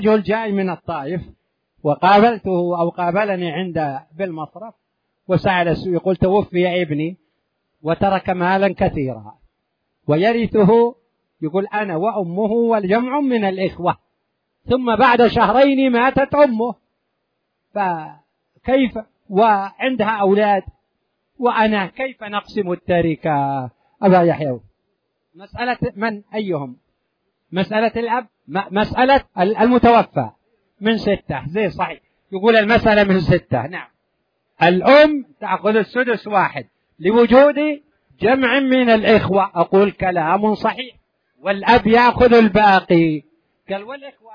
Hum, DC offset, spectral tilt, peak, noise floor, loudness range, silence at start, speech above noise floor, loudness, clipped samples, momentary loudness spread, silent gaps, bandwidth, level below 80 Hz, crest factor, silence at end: none; under 0.1%; -8.5 dB/octave; 0 dBFS; -73 dBFS; 6 LU; 0 s; 56 dB; -17 LUFS; under 0.1%; 14 LU; none; 5.4 kHz; -44 dBFS; 18 dB; 0 s